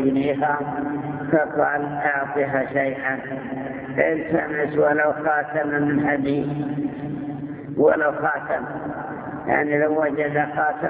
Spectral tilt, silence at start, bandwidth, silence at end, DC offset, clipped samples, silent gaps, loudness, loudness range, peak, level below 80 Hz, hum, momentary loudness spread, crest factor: -10.5 dB/octave; 0 s; 4 kHz; 0 s; under 0.1%; under 0.1%; none; -22 LUFS; 2 LU; -4 dBFS; -56 dBFS; none; 11 LU; 18 dB